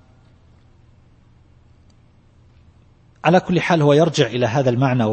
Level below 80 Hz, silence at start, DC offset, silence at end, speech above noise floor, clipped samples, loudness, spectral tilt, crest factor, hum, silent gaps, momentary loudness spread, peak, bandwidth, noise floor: -54 dBFS; 3.25 s; under 0.1%; 0 s; 36 dB; under 0.1%; -17 LUFS; -6.5 dB/octave; 20 dB; none; none; 4 LU; 0 dBFS; 8.8 kHz; -52 dBFS